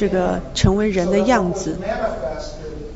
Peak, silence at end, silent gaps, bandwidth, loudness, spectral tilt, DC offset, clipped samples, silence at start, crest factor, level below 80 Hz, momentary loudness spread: 0 dBFS; 0 s; none; 8 kHz; -19 LUFS; -6 dB/octave; under 0.1%; under 0.1%; 0 s; 20 dB; -32 dBFS; 13 LU